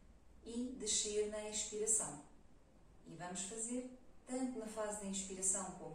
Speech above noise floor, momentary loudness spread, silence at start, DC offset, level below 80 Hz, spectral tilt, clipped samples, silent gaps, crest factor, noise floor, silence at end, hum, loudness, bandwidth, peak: 22 dB; 17 LU; 0 s; under 0.1%; -66 dBFS; -2 dB/octave; under 0.1%; none; 20 dB; -64 dBFS; 0 s; none; -40 LUFS; 16 kHz; -22 dBFS